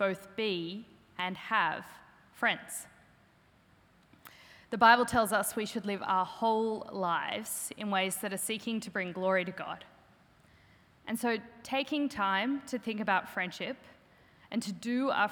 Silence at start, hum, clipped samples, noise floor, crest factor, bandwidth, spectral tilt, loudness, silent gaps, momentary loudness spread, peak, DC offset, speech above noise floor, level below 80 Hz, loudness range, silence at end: 0 s; none; under 0.1%; -64 dBFS; 24 dB; over 20 kHz; -3.5 dB/octave; -32 LUFS; none; 13 LU; -8 dBFS; under 0.1%; 33 dB; -70 dBFS; 7 LU; 0 s